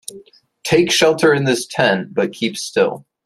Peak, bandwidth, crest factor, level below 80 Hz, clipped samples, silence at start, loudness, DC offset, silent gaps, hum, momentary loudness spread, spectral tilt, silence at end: -2 dBFS; 14.5 kHz; 16 dB; -56 dBFS; under 0.1%; 0.1 s; -16 LUFS; under 0.1%; none; none; 9 LU; -4 dB/octave; 0.25 s